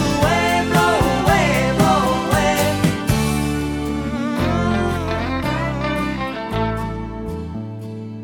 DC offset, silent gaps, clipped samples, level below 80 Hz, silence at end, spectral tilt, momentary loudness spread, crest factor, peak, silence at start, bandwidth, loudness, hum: under 0.1%; none; under 0.1%; -32 dBFS; 0 s; -5.5 dB/octave; 12 LU; 16 dB; -4 dBFS; 0 s; 19.5 kHz; -19 LUFS; none